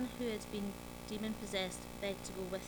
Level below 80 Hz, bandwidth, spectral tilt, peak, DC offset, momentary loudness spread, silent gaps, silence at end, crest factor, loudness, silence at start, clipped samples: -58 dBFS; over 20 kHz; -4 dB/octave; -24 dBFS; under 0.1%; 5 LU; none; 0 s; 18 dB; -42 LUFS; 0 s; under 0.1%